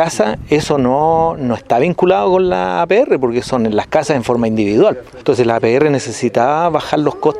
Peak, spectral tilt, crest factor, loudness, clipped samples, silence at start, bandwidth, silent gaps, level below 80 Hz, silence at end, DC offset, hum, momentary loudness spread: 0 dBFS; -6 dB/octave; 14 dB; -14 LUFS; under 0.1%; 0 s; 13 kHz; none; -42 dBFS; 0 s; under 0.1%; none; 4 LU